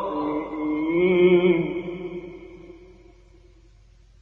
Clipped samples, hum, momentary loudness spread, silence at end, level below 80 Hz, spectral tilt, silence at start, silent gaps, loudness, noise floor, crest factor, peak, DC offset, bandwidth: under 0.1%; none; 22 LU; 1.35 s; -52 dBFS; -9 dB/octave; 0 s; none; -22 LUFS; -53 dBFS; 16 dB; -8 dBFS; under 0.1%; 4 kHz